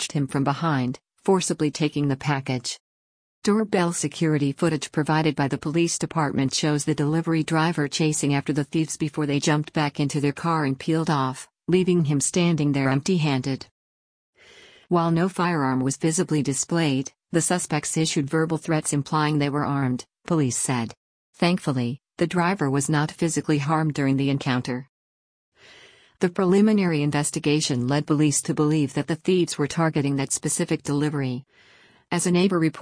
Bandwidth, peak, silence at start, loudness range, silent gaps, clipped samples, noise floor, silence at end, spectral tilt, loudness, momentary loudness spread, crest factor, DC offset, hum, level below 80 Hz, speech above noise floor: 10.5 kHz; -8 dBFS; 0 s; 2 LU; 2.80-3.42 s, 13.71-14.33 s, 20.97-21.33 s, 24.89-25.52 s; under 0.1%; -52 dBFS; 0 s; -5 dB/octave; -23 LUFS; 5 LU; 16 dB; under 0.1%; none; -60 dBFS; 29 dB